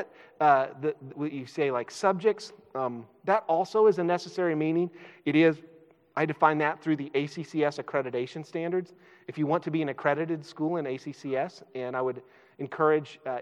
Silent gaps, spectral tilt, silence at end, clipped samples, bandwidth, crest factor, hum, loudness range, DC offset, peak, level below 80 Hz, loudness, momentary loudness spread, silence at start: none; -6.5 dB/octave; 0 s; under 0.1%; 10.5 kHz; 22 dB; none; 4 LU; under 0.1%; -8 dBFS; -88 dBFS; -28 LUFS; 13 LU; 0 s